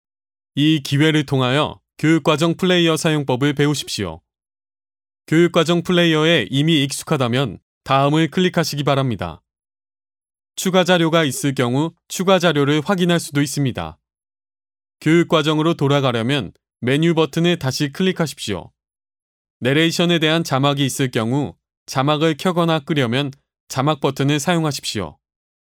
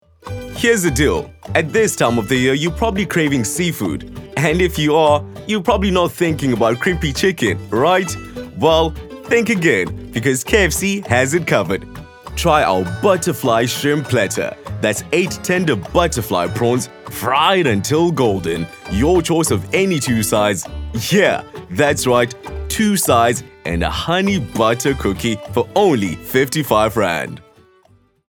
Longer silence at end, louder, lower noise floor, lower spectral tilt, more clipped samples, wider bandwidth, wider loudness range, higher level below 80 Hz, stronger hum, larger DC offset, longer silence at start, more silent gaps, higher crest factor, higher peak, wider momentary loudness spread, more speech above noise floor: second, 0.5 s vs 0.9 s; about the same, -18 LUFS vs -17 LUFS; first, under -90 dBFS vs -53 dBFS; about the same, -5 dB/octave vs -4.5 dB/octave; neither; second, 17.5 kHz vs over 20 kHz; about the same, 3 LU vs 1 LU; second, -56 dBFS vs -34 dBFS; neither; neither; first, 0.55 s vs 0.25 s; first, 7.62-7.81 s, 19.22-19.60 s, 21.77-21.86 s, 23.60-23.67 s vs none; about the same, 18 dB vs 16 dB; about the same, 0 dBFS vs 0 dBFS; about the same, 10 LU vs 9 LU; first, over 73 dB vs 37 dB